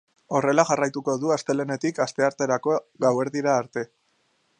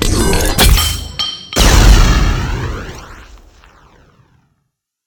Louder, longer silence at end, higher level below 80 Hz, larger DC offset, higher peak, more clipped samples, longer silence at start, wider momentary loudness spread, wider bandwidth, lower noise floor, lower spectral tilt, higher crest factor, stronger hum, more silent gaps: second, -24 LUFS vs -12 LUFS; second, 0.75 s vs 1.85 s; second, -72 dBFS vs -16 dBFS; neither; about the same, -2 dBFS vs 0 dBFS; second, under 0.1% vs 0.2%; first, 0.3 s vs 0 s; second, 7 LU vs 15 LU; second, 10 kHz vs 20 kHz; about the same, -68 dBFS vs -69 dBFS; first, -5 dB/octave vs -3.5 dB/octave; first, 22 dB vs 12 dB; neither; neither